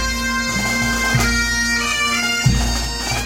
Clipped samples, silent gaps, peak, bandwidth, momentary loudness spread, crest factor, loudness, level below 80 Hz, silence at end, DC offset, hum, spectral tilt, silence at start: under 0.1%; none; -2 dBFS; 16 kHz; 3 LU; 16 dB; -17 LUFS; -26 dBFS; 0 s; under 0.1%; none; -3 dB/octave; 0 s